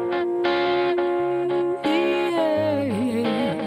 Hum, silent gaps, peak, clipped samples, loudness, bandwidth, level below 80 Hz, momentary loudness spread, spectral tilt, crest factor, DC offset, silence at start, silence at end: none; none; -10 dBFS; under 0.1%; -22 LUFS; 10.5 kHz; -62 dBFS; 2 LU; -6.5 dB/octave; 12 dB; under 0.1%; 0 s; 0 s